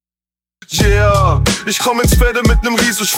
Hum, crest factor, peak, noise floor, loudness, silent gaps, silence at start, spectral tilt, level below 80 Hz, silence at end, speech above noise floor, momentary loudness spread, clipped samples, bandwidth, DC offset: none; 12 dB; 0 dBFS; under -90 dBFS; -13 LUFS; none; 0.7 s; -4 dB/octave; -18 dBFS; 0 s; over 78 dB; 4 LU; under 0.1%; 17.5 kHz; under 0.1%